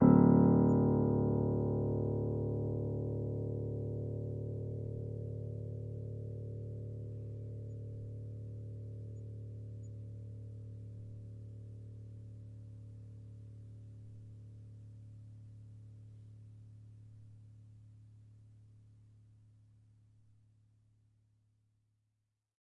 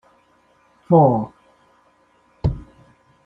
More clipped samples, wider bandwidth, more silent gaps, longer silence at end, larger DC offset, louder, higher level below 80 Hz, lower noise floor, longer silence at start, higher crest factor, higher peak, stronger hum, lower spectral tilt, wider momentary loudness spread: neither; second, 2.2 kHz vs 5.2 kHz; neither; first, 3.95 s vs 0.6 s; neither; second, -36 LUFS vs -18 LUFS; second, -58 dBFS vs -42 dBFS; first, -85 dBFS vs -58 dBFS; second, 0 s vs 0.9 s; about the same, 24 dB vs 20 dB; second, -12 dBFS vs -2 dBFS; second, none vs 60 Hz at -50 dBFS; about the same, -12.5 dB/octave vs -11.5 dB/octave; first, 24 LU vs 19 LU